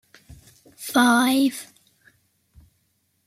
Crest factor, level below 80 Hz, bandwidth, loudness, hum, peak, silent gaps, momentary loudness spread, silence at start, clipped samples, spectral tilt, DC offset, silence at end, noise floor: 18 dB; -62 dBFS; 15.5 kHz; -19 LUFS; none; -6 dBFS; none; 20 LU; 0.8 s; under 0.1%; -2.5 dB/octave; under 0.1%; 1.65 s; -69 dBFS